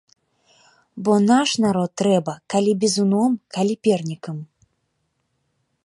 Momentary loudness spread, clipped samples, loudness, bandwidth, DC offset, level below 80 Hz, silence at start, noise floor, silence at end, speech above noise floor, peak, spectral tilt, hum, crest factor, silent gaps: 11 LU; under 0.1%; -20 LUFS; 11.5 kHz; under 0.1%; -64 dBFS; 0.95 s; -72 dBFS; 1.4 s; 52 dB; -4 dBFS; -5.5 dB/octave; none; 18 dB; none